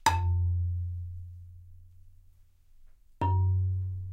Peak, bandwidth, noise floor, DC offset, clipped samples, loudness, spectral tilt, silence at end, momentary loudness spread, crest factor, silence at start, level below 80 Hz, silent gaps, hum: -8 dBFS; 13 kHz; -58 dBFS; under 0.1%; under 0.1%; -30 LUFS; -5 dB/octave; 0 s; 19 LU; 22 dB; 0.05 s; -50 dBFS; none; none